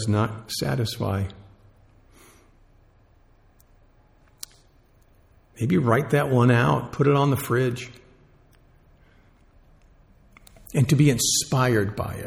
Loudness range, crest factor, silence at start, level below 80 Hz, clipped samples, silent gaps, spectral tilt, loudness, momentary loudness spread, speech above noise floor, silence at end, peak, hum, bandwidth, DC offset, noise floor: 12 LU; 18 dB; 0 s; -52 dBFS; under 0.1%; none; -5 dB/octave; -22 LUFS; 16 LU; 35 dB; 0 s; -6 dBFS; none; 17.5 kHz; under 0.1%; -57 dBFS